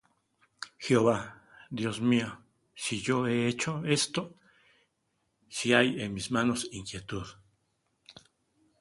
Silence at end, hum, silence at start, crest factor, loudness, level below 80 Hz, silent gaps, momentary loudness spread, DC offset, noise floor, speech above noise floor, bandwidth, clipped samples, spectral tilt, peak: 0.7 s; none; 0.6 s; 26 dB; -30 LUFS; -62 dBFS; none; 15 LU; under 0.1%; -77 dBFS; 48 dB; 11.5 kHz; under 0.1%; -4.5 dB/octave; -6 dBFS